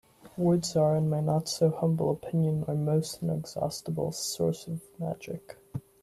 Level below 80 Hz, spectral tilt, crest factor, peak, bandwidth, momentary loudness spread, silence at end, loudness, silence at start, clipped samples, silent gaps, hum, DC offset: -62 dBFS; -6.5 dB/octave; 16 dB; -14 dBFS; 13.5 kHz; 14 LU; 0.2 s; -29 LUFS; 0.25 s; under 0.1%; none; none; under 0.1%